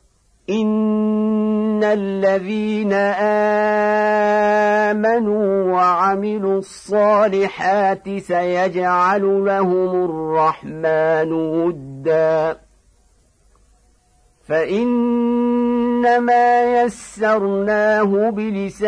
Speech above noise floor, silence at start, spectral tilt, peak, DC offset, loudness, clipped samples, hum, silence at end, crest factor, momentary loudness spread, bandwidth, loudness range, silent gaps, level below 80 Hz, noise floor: 40 dB; 0.5 s; -6.5 dB/octave; -4 dBFS; under 0.1%; -17 LUFS; under 0.1%; none; 0 s; 12 dB; 6 LU; 10.5 kHz; 5 LU; none; -56 dBFS; -56 dBFS